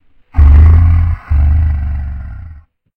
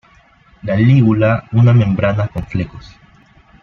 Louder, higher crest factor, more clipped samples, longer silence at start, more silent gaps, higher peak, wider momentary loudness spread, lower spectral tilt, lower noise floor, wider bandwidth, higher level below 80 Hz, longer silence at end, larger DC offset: first, -11 LUFS vs -14 LUFS; about the same, 10 dB vs 14 dB; first, 1% vs under 0.1%; second, 0.35 s vs 0.65 s; neither; about the same, 0 dBFS vs -2 dBFS; first, 19 LU vs 12 LU; about the same, -10.5 dB/octave vs -9.5 dB/octave; second, -36 dBFS vs -49 dBFS; second, 2.9 kHz vs 5.8 kHz; first, -12 dBFS vs -40 dBFS; second, 0.45 s vs 0.75 s; neither